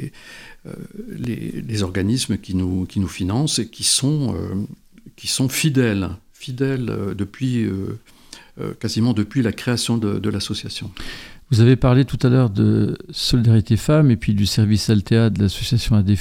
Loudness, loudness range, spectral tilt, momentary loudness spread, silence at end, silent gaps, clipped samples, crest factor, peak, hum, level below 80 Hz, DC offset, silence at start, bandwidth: -19 LUFS; 7 LU; -5.5 dB/octave; 17 LU; 0 s; none; under 0.1%; 16 dB; -2 dBFS; none; -40 dBFS; under 0.1%; 0 s; 16.5 kHz